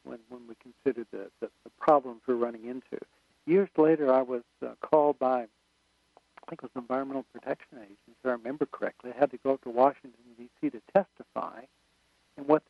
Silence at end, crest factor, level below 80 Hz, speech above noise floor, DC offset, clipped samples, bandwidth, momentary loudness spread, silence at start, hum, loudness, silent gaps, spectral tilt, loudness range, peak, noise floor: 0.1 s; 22 dB; -76 dBFS; 42 dB; under 0.1%; under 0.1%; 6.2 kHz; 18 LU; 0.05 s; none; -29 LUFS; none; -8.5 dB/octave; 8 LU; -8 dBFS; -71 dBFS